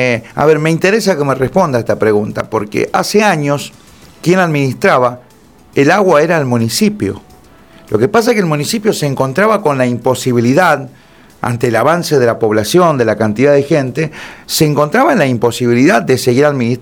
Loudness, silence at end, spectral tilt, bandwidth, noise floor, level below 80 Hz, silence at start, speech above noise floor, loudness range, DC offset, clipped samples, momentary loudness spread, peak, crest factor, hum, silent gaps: -12 LUFS; 0 s; -5.5 dB/octave; 19.5 kHz; -43 dBFS; -48 dBFS; 0 s; 31 dB; 2 LU; 0.1%; under 0.1%; 8 LU; 0 dBFS; 12 dB; none; none